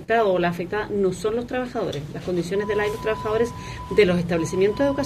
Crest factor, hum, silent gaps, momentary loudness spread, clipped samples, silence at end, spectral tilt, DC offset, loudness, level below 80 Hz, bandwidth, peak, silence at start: 18 dB; none; none; 8 LU; under 0.1%; 0 s; -6 dB/octave; under 0.1%; -23 LUFS; -46 dBFS; 14.5 kHz; -6 dBFS; 0 s